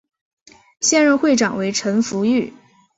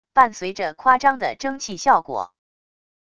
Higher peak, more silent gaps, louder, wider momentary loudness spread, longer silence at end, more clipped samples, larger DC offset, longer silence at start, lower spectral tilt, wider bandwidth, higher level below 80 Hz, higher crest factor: about the same, -4 dBFS vs -2 dBFS; neither; first, -17 LUFS vs -20 LUFS; second, 7 LU vs 12 LU; second, 0.45 s vs 0.8 s; neither; second, under 0.1% vs 0.4%; first, 0.8 s vs 0.15 s; about the same, -3.5 dB/octave vs -3 dB/octave; second, 8.2 kHz vs 10 kHz; about the same, -60 dBFS vs -58 dBFS; about the same, 16 dB vs 20 dB